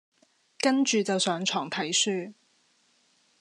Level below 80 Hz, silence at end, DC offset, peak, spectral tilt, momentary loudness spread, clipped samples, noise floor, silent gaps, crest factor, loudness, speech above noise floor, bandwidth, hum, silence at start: -86 dBFS; 1.1 s; under 0.1%; -10 dBFS; -2.5 dB/octave; 6 LU; under 0.1%; -67 dBFS; none; 20 dB; -26 LUFS; 40 dB; 11.5 kHz; none; 0.65 s